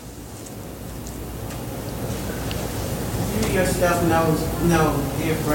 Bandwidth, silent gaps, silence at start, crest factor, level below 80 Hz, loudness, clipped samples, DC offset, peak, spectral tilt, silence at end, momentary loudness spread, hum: 17 kHz; none; 0 s; 16 dB; -36 dBFS; -23 LUFS; under 0.1%; under 0.1%; -6 dBFS; -5.5 dB/octave; 0 s; 16 LU; none